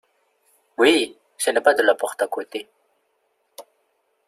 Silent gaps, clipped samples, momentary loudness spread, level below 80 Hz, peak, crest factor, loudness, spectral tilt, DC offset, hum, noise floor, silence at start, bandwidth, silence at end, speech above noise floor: none; under 0.1%; 16 LU; -70 dBFS; -2 dBFS; 22 dB; -20 LUFS; -1.5 dB/octave; under 0.1%; none; -69 dBFS; 0.8 s; 15 kHz; 0.65 s; 50 dB